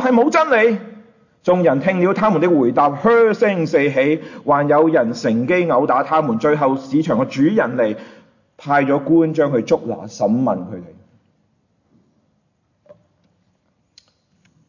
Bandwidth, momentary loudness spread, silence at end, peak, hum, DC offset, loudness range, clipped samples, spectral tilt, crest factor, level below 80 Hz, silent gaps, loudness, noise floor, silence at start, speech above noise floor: 7.4 kHz; 8 LU; 3.8 s; -4 dBFS; none; under 0.1%; 7 LU; under 0.1%; -7 dB/octave; 14 dB; -62 dBFS; none; -16 LUFS; -65 dBFS; 0 s; 49 dB